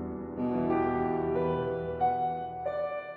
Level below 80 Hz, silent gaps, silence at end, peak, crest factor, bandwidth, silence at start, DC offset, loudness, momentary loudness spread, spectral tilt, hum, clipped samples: -54 dBFS; none; 0 s; -18 dBFS; 14 dB; 4.8 kHz; 0 s; under 0.1%; -31 LUFS; 6 LU; -10.5 dB/octave; none; under 0.1%